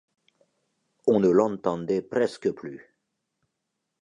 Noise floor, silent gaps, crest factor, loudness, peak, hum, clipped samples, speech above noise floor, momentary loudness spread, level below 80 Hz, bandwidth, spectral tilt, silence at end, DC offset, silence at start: -81 dBFS; none; 20 dB; -25 LUFS; -8 dBFS; none; under 0.1%; 57 dB; 19 LU; -66 dBFS; 10.5 kHz; -7.5 dB/octave; 1.25 s; under 0.1%; 1.05 s